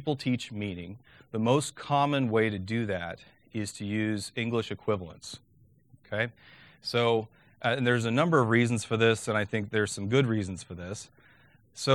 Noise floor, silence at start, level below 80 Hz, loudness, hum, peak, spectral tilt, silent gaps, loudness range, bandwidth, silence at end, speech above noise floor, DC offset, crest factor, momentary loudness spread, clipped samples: -61 dBFS; 0 s; -64 dBFS; -29 LUFS; none; -8 dBFS; -5.5 dB/octave; none; 7 LU; 13 kHz; 0 s; 33 dB; under 0.1%; 20 dB; 16 LU; under 0.1%